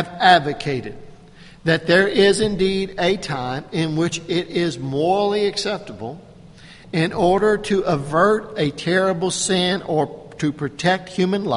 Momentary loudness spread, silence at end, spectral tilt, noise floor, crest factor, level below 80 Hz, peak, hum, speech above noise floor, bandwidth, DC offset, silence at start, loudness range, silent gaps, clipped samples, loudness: 10 LU; 0 s; -4.5 dB/octave; -44 dBFS; 20 dB; -46 dBFS; 0 dBFS; none; 24 dB; 11.5 kHz; under 0.1%; 0 s; 3 LU; none; under 0.1%; -20 LUFS